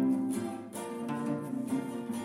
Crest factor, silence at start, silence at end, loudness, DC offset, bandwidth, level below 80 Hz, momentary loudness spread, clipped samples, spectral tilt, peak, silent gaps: 14 dB; 0 s; 0 s; -35 LUFS; under 0.1%; 16 kHz; -80 dBFS; 7 LU; under 0.1%; -6 dB/octave; -20 dBFS; none